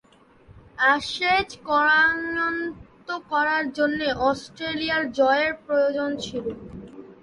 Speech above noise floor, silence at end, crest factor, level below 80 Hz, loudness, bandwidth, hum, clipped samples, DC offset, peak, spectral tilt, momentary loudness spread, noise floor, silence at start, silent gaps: 29 dB; 0.1 s; 16 dB; -54 dBFS; -23 LUFS; 11.5 kHz; none; under 0.1%; under 0.1%; -8 dBFS; -4 dB/octave; 15 LU; -53 dBFS; 0.5 s; none